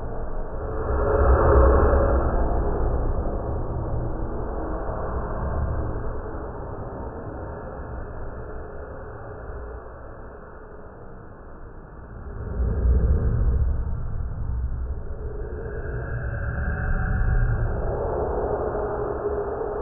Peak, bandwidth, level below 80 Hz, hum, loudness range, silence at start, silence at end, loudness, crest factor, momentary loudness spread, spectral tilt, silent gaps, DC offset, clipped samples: -6 dBFS; 2.7 kHz; -26 dBFS; none; 16 LU; 0 s; 0 s; -26 LUFS; 20 dB; 19 LU; -11.5 dB/octave; none; under 0.1%; under 0.1%